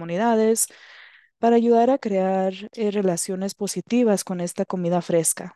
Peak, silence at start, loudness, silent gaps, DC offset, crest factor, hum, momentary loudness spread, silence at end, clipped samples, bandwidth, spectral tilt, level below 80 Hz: -8 dBFS; 0 s; -22 LUFS; none; under 0.1%; 14 dB; none; 9 LU; 0.05 s; under 0.1%; 12.5 kHz; -5 dB/octave; -72 dBFS